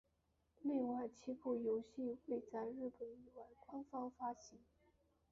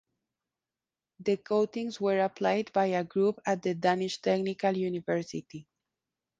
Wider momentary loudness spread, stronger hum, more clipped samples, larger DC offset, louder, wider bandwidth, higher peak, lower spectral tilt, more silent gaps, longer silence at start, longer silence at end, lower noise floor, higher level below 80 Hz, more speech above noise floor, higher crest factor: first, 15 LU vs 6 LU; neither; neither; neither; second, -46 LUFS vs -30 LUFS; second, 7.4 kHz vs 9.2 kHz; second, -32 dBFS vs -12 dBFS; about the same, -6.5 dB/octave vs -6 dB/octave; neither; second, 0.6 s vs 1.2 s; about the same, 0.75 s vs 0.8 s; second, -82 dBFS vs under -90 dBFS; second, -80 dBFS vs -74 dBFS; second, 37 dB vs over 61 dB; about the same, 16 dB vs 18 dB